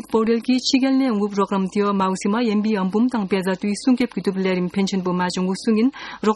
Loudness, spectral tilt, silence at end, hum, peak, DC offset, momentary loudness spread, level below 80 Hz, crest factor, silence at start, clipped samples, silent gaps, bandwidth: -20 LUFS; -5.5 dB/octave; 0 s; none; -4 dBFS; under 0.1%; 4 LU; -58 dBFS; 16 dB; 0.05 s; under 0.1%; none; 12 kHz